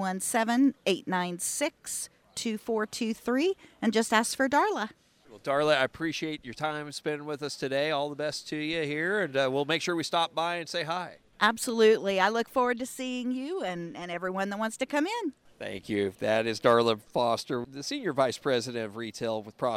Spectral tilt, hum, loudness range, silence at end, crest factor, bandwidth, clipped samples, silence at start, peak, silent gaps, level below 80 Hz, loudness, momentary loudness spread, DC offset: -3.5 dB/octave; none; 4 LU; 0 s; 20 dB; 16 kHz; under 0.1%; 0 s; -10 dBFS; none; -68 dBFS; -29 LUFS; 10 LU; under 0.1%